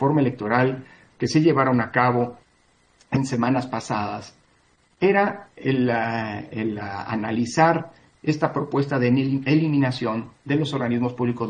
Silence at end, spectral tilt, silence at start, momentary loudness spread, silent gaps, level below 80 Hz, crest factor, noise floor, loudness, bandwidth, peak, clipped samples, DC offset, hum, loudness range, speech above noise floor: 0 s; -7 dB/octave; 0 s; 10 LU; none; -60 dBFS; 20 dB; -61 dBFS; -23 LUFS; 9.8 kHz; -4 dBFS; under 0.1%; under 0.1%; none; 3 LU; 39 dB